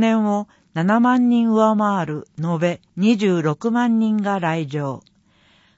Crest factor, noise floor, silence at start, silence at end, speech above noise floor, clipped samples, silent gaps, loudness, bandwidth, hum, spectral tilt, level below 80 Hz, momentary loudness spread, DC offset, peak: 14 dB; -57 dBFS; 0 s; 0.8 s; 38 dB; under 0.1%; none; -19 LUFS; 8 kHz; none; -7 dB/octave; -66 dBFS; 11 LU; under 0.1%; -4 dBFS